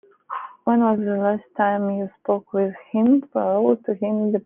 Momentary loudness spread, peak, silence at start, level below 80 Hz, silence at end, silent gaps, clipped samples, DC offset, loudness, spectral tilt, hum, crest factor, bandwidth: 9 LU; -4 dBFS; 0.3 s; -70 dBFS; 0.05 s; none; under 0.1%; under 0.1%; -21 LUFS; -11.5 dB/octave; none; 16 dB; 3.5 kHz